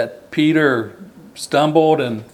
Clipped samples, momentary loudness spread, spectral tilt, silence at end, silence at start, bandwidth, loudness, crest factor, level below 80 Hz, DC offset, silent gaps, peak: under 0.1%; 11 LU; -5.5 dB/octave; 0.1 s; 0 s; 13.5 kHz; -16 LUFS; 16 dB; -64 dBFS; under 0.1%; none; 0 dBFS